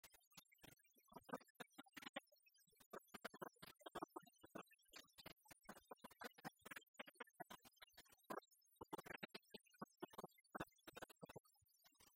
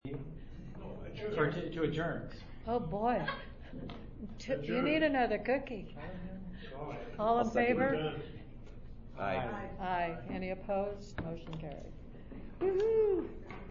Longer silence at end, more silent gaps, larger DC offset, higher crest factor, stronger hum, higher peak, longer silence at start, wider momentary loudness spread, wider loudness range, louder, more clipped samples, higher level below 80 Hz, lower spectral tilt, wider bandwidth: about the same, 0 s vs 0 s; first, 0.27-0.31 s, 1.50-1.55 s, 2.09-2.14 s, 2.86-2.91 s, 6.88-6.94 s, 11.40-11.44 s vs none; neither; first, 26 dB vs 18 dB; neither; second, -36 dBFS vs -18 dBFS; about the same, 0.05 s vs 0.05 s; second, 10 LU vs 19 LU; second, 2 LU vs 5 LU; second, -60 LUFS vs -35 LUFS; neither; second, -88 dBFS vs -50 dBFS; second, -3.5 dB/octave vs -5 dB/octave; first, 16 kHz vs 7 kHz